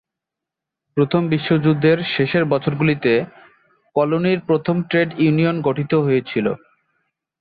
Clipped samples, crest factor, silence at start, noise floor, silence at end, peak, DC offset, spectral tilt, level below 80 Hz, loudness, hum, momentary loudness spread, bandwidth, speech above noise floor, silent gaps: under 0.1%; 16 dB; 0.95 s; -85 dBFS; 0.85 s; -4 dBFS; under 0.1%; -10.5 dB/octave; -56 dBFS; -18 LUFS; none; 6 LU; 5 kHz; 67 dB; none